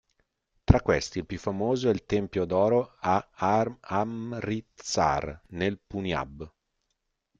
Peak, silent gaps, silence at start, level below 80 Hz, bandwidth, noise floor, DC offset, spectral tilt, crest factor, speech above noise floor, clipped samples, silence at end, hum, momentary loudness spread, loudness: -2 dBFS; none; 0.7 s; -44 dBFS; 9 kHz; -79 dBFS; under 0.1%; -6 dB/octave; 26 dB; 52 dB; under 0.1%; 0.9 s; none; 10 LU; -28 LUFS